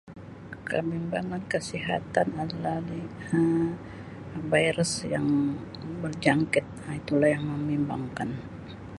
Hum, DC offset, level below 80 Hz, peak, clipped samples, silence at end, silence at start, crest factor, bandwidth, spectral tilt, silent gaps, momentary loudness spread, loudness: none; under 0.1%; -54 dBFS; -6 dBFS; under 0.1%; 0 s; 0.05 s; 22 dB; 11.5 kHz; -5.5 dB/octave; none; 15 LU; -28 LUFS